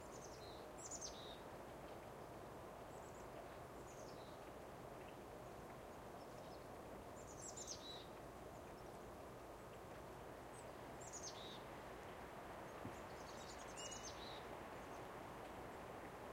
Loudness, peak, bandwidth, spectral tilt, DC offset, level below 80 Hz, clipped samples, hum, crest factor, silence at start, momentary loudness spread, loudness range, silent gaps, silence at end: -54 LUFS; -38 dBFS; 16 kHz; -3.5 dB/octave; under 0.1%; -70 dBFS; under 0.1%; none; 18 dB; 0 s; 5 LU; 3 LU; none; 0 s